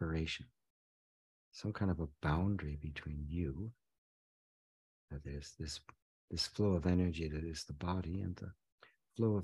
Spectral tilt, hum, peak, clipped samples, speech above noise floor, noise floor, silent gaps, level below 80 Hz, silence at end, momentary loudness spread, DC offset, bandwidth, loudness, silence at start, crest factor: -6.5 dB/octave; none; -22 dBFS; under 0.1%; over 52 dB; under -90 dBFS; 0.70-1.52 s, 3.98-5.08 s, 6.02-6.28 s, 8.72-8.78 s; -52 dBFS; 0 s; 15 LU; under 0.1%; 12 kHz; -40 LUFS; 0 s; 18 dB